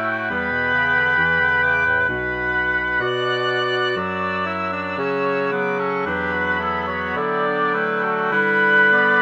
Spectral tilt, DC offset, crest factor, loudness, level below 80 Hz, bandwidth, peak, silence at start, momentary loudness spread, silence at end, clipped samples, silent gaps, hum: -6 dB/octave; under 0.1%; 14 dB; -19 LUFS; -46 dBFS; 7.8 kHz; -6 dBFS; 0 s; 7 LU; 0 s; under 0.1%; none; none